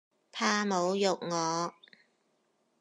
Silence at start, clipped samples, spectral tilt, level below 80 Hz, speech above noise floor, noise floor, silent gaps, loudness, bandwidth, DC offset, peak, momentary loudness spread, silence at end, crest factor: 0.35 s; under 0.1%; -3.5 dB/octave; under -90 dBFS; 44 dB; -74 dBFS; none; -30 LUFS; 11.5 kHz; under 0.1%; -14 dBFS; 8 LU; 1.1 s; 20 dB